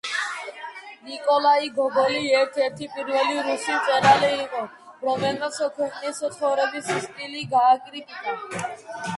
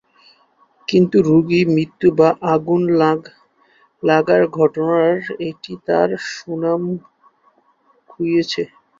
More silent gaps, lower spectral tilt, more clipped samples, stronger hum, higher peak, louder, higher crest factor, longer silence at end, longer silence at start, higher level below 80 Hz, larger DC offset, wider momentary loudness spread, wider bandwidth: neither; second, -3.5 dB/octave vs -7 dB/octave; neither; neither; about the same, -4 dBFS vs -2 dBFS; second, -23 LUFS vs -17 LUFS; about the same, 20 dB vs 16 dB; second, 0 s vs 0.35 s; second, 0.05 s vs 0.9 s; second, -68 dBFS vs -58 dBFS; neither; about the same, 14 LU vs 12 LU; first, 11.5 kHz vs 7.6 kHz